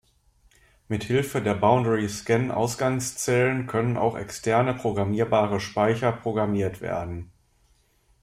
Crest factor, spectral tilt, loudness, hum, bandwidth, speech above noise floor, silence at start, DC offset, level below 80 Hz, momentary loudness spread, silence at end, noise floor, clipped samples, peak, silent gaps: 20 dB; -5.5 dB/octave; -25 LUFS; none; 16 kHz; 39 dB; 0.9 s; under 0.1%; -54 dBFS; 8 LU; 1 s; -63 dBFS; under 0.1%; -6 dBFS; none